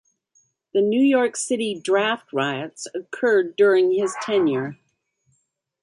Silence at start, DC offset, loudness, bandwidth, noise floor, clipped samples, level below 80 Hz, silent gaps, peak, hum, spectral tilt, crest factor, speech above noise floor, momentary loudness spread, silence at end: 0.75 s; under 0.1%; -21 LUFS; 11.5 kHz; -71 dBFS; under 0.1%; -72 dBFS; none; -6 dBFS; none; -4 dB/octave; 16 dB; 51 dB; 12 LU; 1.1 s